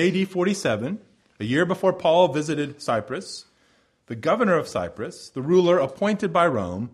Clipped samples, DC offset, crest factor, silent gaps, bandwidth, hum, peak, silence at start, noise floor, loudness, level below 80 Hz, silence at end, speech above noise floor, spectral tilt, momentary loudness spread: under 0.1%; under 0.1%; 18 dB; none; 12.5 kHz; none; -6 dBFS; 0 s; -63 dBFS; -23 LUFS; -60 dBFS; 0.05 s; 40 dB; -6 dB/octave; 14 LU